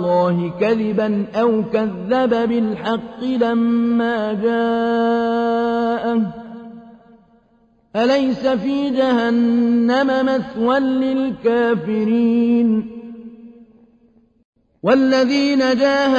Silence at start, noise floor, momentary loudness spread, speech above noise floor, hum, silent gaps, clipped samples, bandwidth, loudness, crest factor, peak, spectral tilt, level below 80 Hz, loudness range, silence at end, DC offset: 0 s; -57 dBFS; 7 LU; 40 dB; none; 14.45-14.53 s; under 0.1%; 7.4 kHz; -18 LUFS; 16 dB; -2 dBFS; -6.5 dB/octave; -56 dBFS; 4 LU; 0 s; under 0.1%